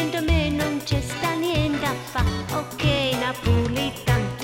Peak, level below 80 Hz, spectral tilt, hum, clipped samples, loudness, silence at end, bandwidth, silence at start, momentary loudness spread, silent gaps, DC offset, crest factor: -8 dBFS; -34 dBFS; -5.5 dB/octave; none; under 0.1%; -23 LUFS; 0 s; 16.5 kHz; 0 s; 4 LU; none; under 0.1%; 16 dB